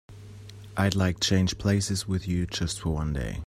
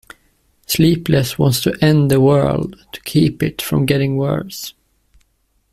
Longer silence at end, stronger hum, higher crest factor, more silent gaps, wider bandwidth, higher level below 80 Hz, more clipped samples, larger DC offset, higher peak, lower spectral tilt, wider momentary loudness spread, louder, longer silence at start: second, 0.05 s vs 1 s; neither; first, 20 dB vs 14 dB; neither; about the same, 15 kHz vs 15.5 kHz; about the same, -42 dBFS vs -44 dBFS; neither; neither; second, -8 dBFS vs -2 dBFS; about the same, -5 dB/octave vs -6 dB/octave; first, 21 LU vs 14 LU; second, -27 LUFS vs -16 LUFS; second, 0.1 s vs 0.7 s